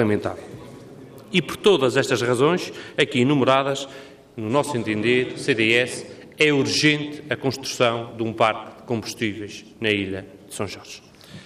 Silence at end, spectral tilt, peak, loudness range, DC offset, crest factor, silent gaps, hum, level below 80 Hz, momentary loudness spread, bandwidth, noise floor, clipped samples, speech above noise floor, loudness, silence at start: 0 s; -4.5 dB/octave; -4 dBFS; 4 LU; under 0.1%; 18 dB; none; none; -62 dBFS; 19 LU; 15.5 kHz; -42 dBFS; under 0.1%; 20 dB; -21 LUFS; 0 s